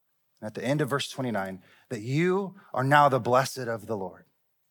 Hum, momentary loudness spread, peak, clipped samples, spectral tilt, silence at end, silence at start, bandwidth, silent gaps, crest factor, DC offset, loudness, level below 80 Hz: none; 19 LU; -6 dBFS; under 0.1%; -5.5 dB/octave; 0.55 s; 0.4 s; 19 kHz; none; 22 dB; under 0.1%; -27 LUFS; -80 dBFS